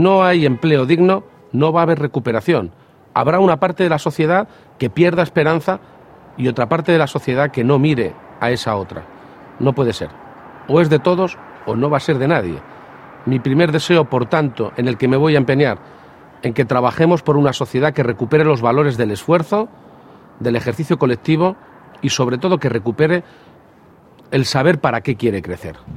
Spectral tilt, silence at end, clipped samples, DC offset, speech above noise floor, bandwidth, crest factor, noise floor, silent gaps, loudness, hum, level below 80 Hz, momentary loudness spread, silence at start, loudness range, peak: -6.5 dB/octave; 0 s; under 0.1%; under 0.1%; 31 dB; 14 kHz; 16 dB; -47 dBFS; none; -16 LUFS; none; -52 dBFS; 11 LU; 0 s; 3 LU; 0 dBFS